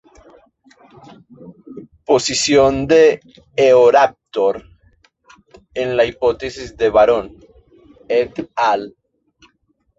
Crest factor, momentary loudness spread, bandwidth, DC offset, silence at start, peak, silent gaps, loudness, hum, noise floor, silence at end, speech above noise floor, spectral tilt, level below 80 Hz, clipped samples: 16 dB; 18 LU; 8.2 kHz; under 0.1%; 1.4 s; -2 dBFS; none; -15 LUFS; none; -64 dBFS; 1.1 s; 49 dB; -4 dB/octave; -48 dBFS; under 0.1%